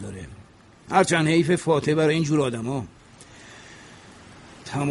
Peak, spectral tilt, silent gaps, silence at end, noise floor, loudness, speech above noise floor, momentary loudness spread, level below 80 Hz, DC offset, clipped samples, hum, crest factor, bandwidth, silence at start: -4 dBFS; -5.5 dB/octave; none; 0 s; -49 dBFS; -22 LUFS; 28 dB; 24 LU; -56 dBFS; under 0.1%; under 0.1%; none; 20 dB; 11.5 kHz; 0 s